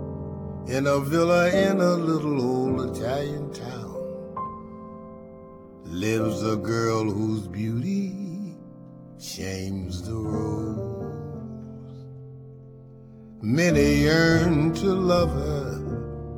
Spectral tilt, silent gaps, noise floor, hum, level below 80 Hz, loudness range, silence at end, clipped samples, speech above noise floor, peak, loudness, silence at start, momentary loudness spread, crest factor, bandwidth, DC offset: -6.5 dB/octave; none; -45 dBFS; none; -42 dBFS; 11 LU; 0 s; under 0.1%; 22 dB; -8 dBFS; -25 LUFS; 0 s; 23 LU; 18 dB; 19 kHz; under 0.1%